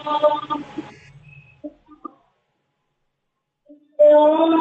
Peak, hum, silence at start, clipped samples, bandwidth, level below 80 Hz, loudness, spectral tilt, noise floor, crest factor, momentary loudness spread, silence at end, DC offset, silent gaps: -4 dBFS; none; 0 s; under 0.1%; 4.4 kHz; -68 dBFS; -16 LUFS; -6.5 dB/octave; -76 dBFS; 16 dB; 27 LU; 0 s; under 0.1%; none